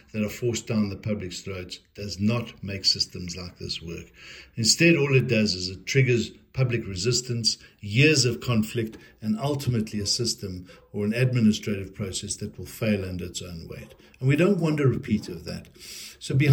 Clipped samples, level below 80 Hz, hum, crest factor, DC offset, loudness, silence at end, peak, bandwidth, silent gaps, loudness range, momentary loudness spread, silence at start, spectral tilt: under 0.1%; -56 dBFS; none; 20 dB; under 0.1%; -25 LUFS; 0 s; -6 dBFS; 17.5 kHz; none; 5 LU; 17 LU; 0.15 s; -4.5 dB/octave